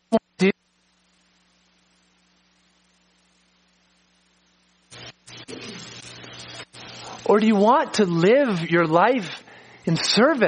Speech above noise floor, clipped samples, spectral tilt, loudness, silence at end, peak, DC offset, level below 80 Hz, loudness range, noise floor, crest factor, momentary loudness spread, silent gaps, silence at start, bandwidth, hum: 47 dB; under 0.1%; -5 dB/octave; -20 LUFS; 0 s; -2 dBFS; under 0.1%; -68 dBFS; 22 LU; -65 dBFS; 20 dB; 21 LU; none; 0.1 s; 10 kHz; 60 Hz at -60 dBFS